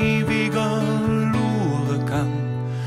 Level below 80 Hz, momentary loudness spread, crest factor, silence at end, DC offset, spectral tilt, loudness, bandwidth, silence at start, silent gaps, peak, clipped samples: -46 dBFS; 4 LU; 14 dB; 0 s; under 0.1%; -7 dB/octave; -22 LUFS; 14.5 kHz; 0 s; none; -8 dBFS; under 0.1%